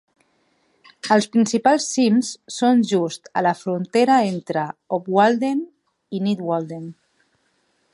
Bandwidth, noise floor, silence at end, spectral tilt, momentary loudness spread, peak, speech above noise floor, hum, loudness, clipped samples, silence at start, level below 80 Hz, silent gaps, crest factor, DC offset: 11.5 kHz; -66 dBFS; 1 s; -5 dB/octave; 12 LU; -2 dBFS; 47 dB; none; -20 LUFS; under 0.1%; 1.05 s; -72 dBFS; none; 18 dB; under 0.1%